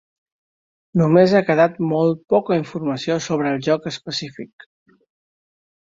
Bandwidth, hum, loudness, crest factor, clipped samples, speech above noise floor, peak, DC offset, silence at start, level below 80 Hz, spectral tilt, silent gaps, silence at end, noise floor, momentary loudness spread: 7.8 kHz; none; -19 LUFS; 18 dB; under 0.1%; over 72 dB; -2 dBFS; under 0.1%; 0.95 s; -62 dBFS; -6.5 dB/octave; none; 1.5 s; under -90 dBFS; 13 LU